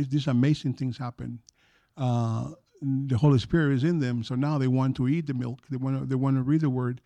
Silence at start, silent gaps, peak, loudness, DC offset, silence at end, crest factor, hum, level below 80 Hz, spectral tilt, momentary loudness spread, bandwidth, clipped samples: 0 s; none; -12 dBFS; -26 LUFS; under 0.1%; 0.1 s; 14 dB; none; -54 dBFS; -8 dB/octave; 12 LU; 8.6 kHz; under 0.1%